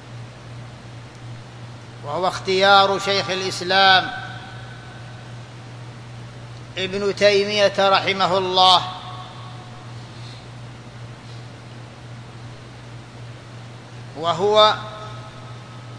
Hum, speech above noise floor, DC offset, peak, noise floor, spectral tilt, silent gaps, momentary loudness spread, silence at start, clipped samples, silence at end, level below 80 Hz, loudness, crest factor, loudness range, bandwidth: none; 21 dB; under 0.1%; 0 dBFS; -38 dBFS; -3.5 dB/octave; none; 24 LU; 0 s; under 0.1%; 0 s; -54 dBFS; -17 LUFS; 22 dB; 20 LU; 11 kHz